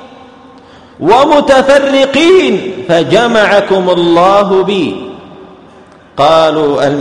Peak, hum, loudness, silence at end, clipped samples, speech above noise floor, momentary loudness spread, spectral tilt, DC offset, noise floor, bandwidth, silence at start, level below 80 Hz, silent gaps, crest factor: 0 dBFS; none; -8 LUFS; 0 s; 0.9%; 30 dB; 9 LU; -5 dB/octave; under 0.1%; -38 dBFS; 10.5 kHz; 0 s; -42 dBFS; none; 10 dB